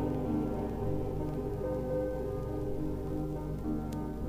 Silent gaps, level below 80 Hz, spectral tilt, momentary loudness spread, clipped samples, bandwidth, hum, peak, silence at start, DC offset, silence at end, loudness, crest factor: none; -42 dBFS; -9 dB/octave; 4 LU; under 0.1%; 15.5 kHz; none; -22 dBFS; 0 s; under 0.1%; 0 s; -35 LUFS; 12 dB